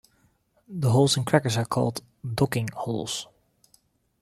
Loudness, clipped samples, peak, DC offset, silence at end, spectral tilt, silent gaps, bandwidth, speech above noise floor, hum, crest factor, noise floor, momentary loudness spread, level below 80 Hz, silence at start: -25 LUFS; under 0.1%; -4 dBFS; under 0.1%; 0.95 s; -5 dB/octave; none; 15 kHz; 41 dB; none; 22 dB; -66 dBFS; 14 LU; -58 dBFS; 0.7 s